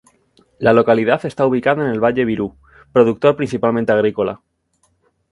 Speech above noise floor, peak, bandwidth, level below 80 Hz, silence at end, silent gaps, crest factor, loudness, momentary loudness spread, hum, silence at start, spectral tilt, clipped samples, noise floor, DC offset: 48 dB; 0 dBFS; 11 kHz; -52 dBFS; 0.95 s; none; 18 dB; -16 LUFS; 9 LU; none; 0.6 s; -7.5 dB/octave; under 0.1%; -63 dBFS; under 0.1%